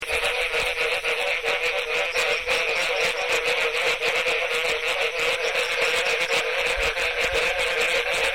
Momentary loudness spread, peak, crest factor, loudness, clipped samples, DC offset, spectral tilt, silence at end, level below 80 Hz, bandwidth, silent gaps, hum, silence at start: 2 LU; -10 dBFS; 14 dB; -22 LUFS; under 0.1%; 0.4%; -0.5 dB/octave; 0 s; -46 dBFS; 16.5 kHz; none; none; 0 s